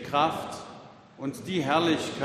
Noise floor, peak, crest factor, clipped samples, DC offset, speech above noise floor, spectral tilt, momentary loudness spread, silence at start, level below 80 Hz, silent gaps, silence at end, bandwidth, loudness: -48 dBFS; -10 dBFS; 18 dB; under 0.1%; under 0.1%; 21 dB; -5 dB/octave; 18 LU; 0 s; -66 dBFS; none; 0 s; 14 kHz; -28 LUFS